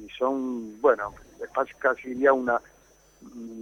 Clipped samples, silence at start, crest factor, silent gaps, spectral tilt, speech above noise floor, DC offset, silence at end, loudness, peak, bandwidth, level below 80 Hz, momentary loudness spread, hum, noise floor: under 0.1%; 0 s; 20 dB; none; -5.5 dB/octave; 32 dB; under 0.1%; 0 s; -26 LUFS; -8 dBFS; 9.2 kHz; -60 dBFS; 19 LU; none; -58 dBFS